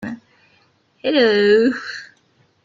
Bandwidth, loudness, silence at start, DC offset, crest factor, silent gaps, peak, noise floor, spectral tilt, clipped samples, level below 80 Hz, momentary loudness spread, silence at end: 7.6 kHz; -16 LUFS; 0 s; under 0.1%; 16 dB; none; -4 dBFS; -59 dBFS; -5.5 dB/octave; under 0.1%; -62 dBFS; 20 LU; 0.6 s